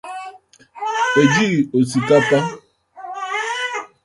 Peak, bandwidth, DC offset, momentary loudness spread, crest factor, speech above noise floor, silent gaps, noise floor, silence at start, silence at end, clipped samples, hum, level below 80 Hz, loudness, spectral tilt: -2 dBFS; 11.5 kHz; under 0.1%; 18 LU; 18 dB; 28 dB; none; -43 dBFS; 0.05 s; 0.2 s; under 0.1%; none; -58 dBFS; -18 LUFS; -5 dB/octave